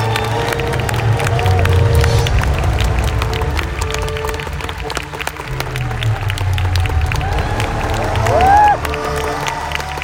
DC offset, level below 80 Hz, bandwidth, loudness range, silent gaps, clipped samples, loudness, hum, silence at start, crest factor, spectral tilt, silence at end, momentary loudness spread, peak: under 0.1%; -24 dBFS; 16.5 kHz; 5 LU; none; under 0.1%; -16 LUFS; none; 0 s; 16 dB; -5 dB/octave; 0 s; 9 LU; 0 dBFS